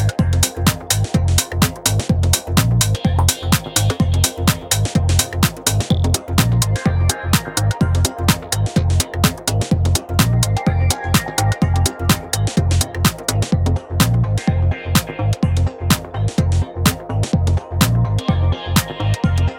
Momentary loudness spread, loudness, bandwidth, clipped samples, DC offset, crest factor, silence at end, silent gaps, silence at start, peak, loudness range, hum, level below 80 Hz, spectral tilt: 3 LU; -17 LUFS; 17.5 kHz; under 0.1%; under 0.1%; 16 dB; 0 s; none; 0 s; 0 dBFS; 2 LU; none; -28 dBFS; -4.5 dB/octave